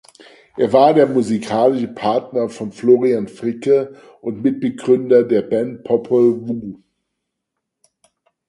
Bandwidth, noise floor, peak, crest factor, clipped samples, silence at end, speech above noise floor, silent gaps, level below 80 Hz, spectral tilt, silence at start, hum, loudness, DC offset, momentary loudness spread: 11.5 kHz; -78 dBFS; 0 dBFS; 18 dB; under 0.1%; 1.75 s; 62 dB; none; -60 dBFS; -7 dB/octave; 0.55 s; none; -17 LUFS; under 0.1%; 13 LU